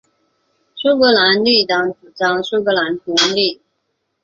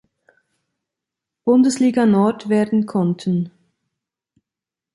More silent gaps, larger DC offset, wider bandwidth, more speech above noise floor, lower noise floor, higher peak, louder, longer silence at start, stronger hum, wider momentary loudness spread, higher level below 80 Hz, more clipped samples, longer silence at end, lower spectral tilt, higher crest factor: neither; neither; second, 7.8 kHz vs 11.5 kHz; second, 55 dB vs 71 dB; second, -70 dBFS vs -88 dBFS; first, 0 dBFS vs -4 dBFS; first, -15 LUFS vs -18 LUFS; second, 0.75 s vs 1.45 s; neither; about the same, 8 LU vs 8 LU; about the same, -60 dBFS vs -64 dBFS; neither; second, 0.7 s vs 1.45 s; second, -3 dB/octave vs -7 dB/octave; about the same, 16 dB vs 16 dB